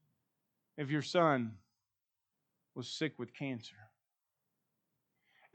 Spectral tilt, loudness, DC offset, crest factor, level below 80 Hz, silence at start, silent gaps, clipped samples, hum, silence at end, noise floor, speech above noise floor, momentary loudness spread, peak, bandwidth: -5.5 dB/octave; -36 LUFS; under 0.1%; 24 dB; under -90 dBFS; 0.75 s; none; under 0.1%; none; 1.7 s; -89 dBFS; 53 dB; 20 LU; -16 dBFS; 9 kHz